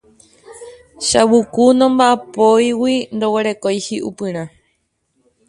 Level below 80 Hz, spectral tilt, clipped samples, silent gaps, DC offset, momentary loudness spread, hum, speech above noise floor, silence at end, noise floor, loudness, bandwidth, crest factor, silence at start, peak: -54 dBFS; -4 dB/octave; under 0.1%; none; under 0.1%; 12 LU; none; 52 dB; 1 s; -66 dBFS; -15 LUFS; 11.5 kHz; 16 dB; 0.5 s; 0 dBFS